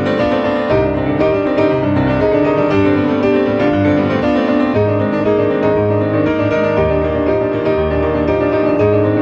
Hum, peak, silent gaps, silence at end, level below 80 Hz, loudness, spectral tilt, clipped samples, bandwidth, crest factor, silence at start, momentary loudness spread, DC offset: none; -2 dBFS; none; 0 s; -34 dBFS; -14 LUFS; -8.5 dB/octave; under 0.1%; 6.8 kHz; 12 dB; 0 s; 2 LU; under 0.1%